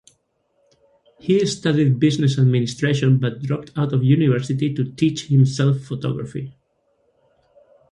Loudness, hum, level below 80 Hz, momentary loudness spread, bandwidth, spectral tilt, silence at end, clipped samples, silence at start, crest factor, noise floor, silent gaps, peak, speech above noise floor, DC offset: -19 LUFS; none; -56 dBFS; 9 LU; 10.5 kHz; -7 dB/octave; 1.4 s; under 0.1%; 1.25 s; 16 dB; -67 dBFS; none; -4 dBFS; 48 dB; under 0.1%